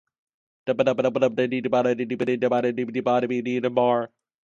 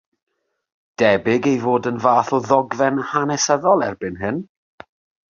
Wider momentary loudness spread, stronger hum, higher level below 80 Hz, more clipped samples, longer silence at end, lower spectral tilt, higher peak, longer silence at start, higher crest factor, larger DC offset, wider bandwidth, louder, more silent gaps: second, 5 LU vs 9 LU; neither; second, -70 dBFS vs -56 dBFS; neither; second, 0.4 s vs 0.85 s; first, -7 dB/octave vs -4.5 dB/octave; second, -6 dBFS vs -2 dBFS; second, 0.65 s vs 1 s; about the same, 18 dB vs 18 dB; neither; about the same, 7.4 kHz vs 7.4 kHz; second, -23 LUFS vs -18 LUFS; neither